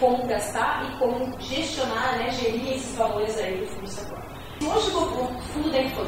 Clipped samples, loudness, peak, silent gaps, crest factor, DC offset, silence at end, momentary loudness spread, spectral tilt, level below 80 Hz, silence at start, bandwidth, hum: under 0.1%; -26 LUFS; -8 dBFS; none; 18 dB; 0.1%; 0 s; 10 LU; -4 dB/octave; -46 dBFS; 0 s; 16 kHz; none